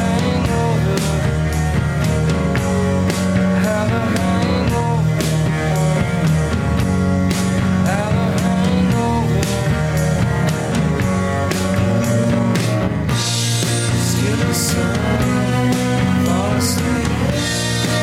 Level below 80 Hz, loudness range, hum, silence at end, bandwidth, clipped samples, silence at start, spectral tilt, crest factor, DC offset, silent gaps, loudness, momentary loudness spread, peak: -30 dBFS; 1 LU; none; 0 s; 16 kHz; under 0.1%; 0 s; -5.5 dB/octave; 12 dB; under 0.1%; none; -17 LUFS; 2 LU; -6 dBFS